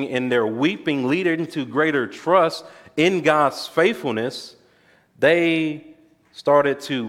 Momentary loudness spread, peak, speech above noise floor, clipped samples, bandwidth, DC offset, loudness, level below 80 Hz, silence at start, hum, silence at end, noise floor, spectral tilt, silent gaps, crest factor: 10 LU; -2 dBFS; 37 dB; under 0.1%; 16 kHz; under 0.1%; -20 LUFS; -68 dBFS; 0 s; none; 0 s; -57 dBFS; -5.5 dB/octave; none; 18 dB